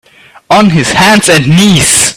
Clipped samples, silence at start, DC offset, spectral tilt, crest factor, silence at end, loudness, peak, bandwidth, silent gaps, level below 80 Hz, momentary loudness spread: 1%; 0.5 s; under 0.1%; -3.5 dB/octave; 6 dB; 0.05 s; -5 LUFS; 0 dBFS; over 20 kHz; none; -36 dBFS; 3 LU